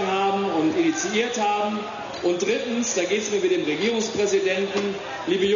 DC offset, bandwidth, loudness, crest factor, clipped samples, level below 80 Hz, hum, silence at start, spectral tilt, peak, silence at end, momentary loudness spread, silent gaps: under 0.1%; 7.4 kHz; -23 LUFS; 14 dB; under 0.1%; -62 dBFS; none; 0 s; -3.5 dB/octave; -10 dBFS; 0 s; 5 LU; none